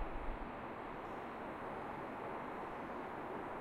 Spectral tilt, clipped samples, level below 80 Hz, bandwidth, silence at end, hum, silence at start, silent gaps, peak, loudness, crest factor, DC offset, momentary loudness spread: -7 dB/octave; under 0.1%; -54 dBFS; 15 kHz; 0 s; none; 0 s; none; -28 dBFS; -46 LUFS; 16 dB; under 0.1%; 2 LU